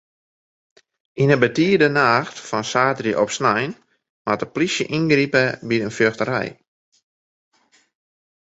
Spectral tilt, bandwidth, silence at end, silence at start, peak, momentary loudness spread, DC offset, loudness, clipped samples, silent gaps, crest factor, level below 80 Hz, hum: -5 dB/octave; 8.2 kHz; 1.95 s; 1.15 s; -2 dBFS; 10 LU; under 0.1%; -19 LUFS; under 0.1%; 4.09-4.25 s; 20 dB; -60 dBFS; none